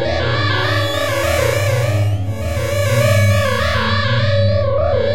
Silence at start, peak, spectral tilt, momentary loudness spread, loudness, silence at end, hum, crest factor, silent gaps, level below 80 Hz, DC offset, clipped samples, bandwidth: 0 s; -4 dBFS; -5 dB/octave; 5 LU; -16 LUFS; 0 s; none; 12 dB; none; -32 dBFS; 4%; under 0.1%; 16 kHz